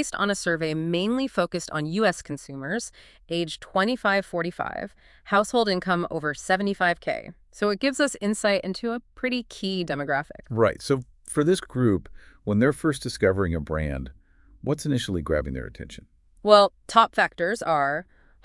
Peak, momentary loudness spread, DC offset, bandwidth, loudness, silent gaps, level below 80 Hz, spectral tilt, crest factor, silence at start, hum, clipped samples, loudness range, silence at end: -2 dBFS; 11 LU; under 0.1%; 12 kHz; -25 LUFS; none; -48 dBFS; -5 dB/octave; 24 dB; 0 s; none; under 0.1%; 4 LU; 0.4 s